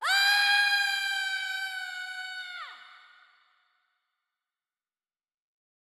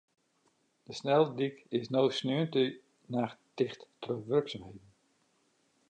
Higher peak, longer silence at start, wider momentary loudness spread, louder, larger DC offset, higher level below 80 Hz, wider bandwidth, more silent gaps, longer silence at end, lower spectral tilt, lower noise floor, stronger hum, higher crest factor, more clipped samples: about the same, -12 dBFS vs -14 dBFS; second, 0 s vs 0.9 s; about the same, 17 LU vs 17 LU; first, -26 LUFS vs -32 LUFS; neither; second, under -90 dBFS vs -74 dBFS; first, 16 kHz vs 9.2 kHz; neither; first, 2.95 s vs 1.1 s; second, 8 dB/octave vs -6.5 dB/octave; first, under -90 dBFS vs -73 dBFS; neither; about the same, 20 dB vs 20 dB; neither